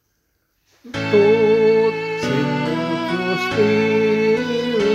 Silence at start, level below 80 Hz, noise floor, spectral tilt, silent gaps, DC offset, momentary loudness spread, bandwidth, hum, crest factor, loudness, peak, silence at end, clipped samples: 0.85 s; -54 dBFS; -68 dBFS; -6 dB/octave; none; under 0.1%; 7 LU; 9 kHz; none; 14 dB; -18 LUFS; -4 dBFS; 0 s; under 0.1%